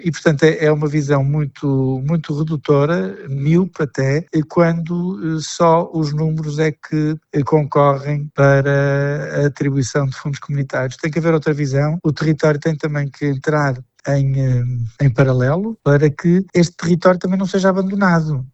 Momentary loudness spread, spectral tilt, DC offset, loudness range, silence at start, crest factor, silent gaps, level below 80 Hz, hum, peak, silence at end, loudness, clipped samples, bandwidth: 7 LU; -7.5 dB/octave; under 0.1%; 3 LU; 0 s; 16 dB; none; -44 dBFS; none; 0 dBFS; 0.05 s; -17 LUFS; under 0.1%; 8.2 kHz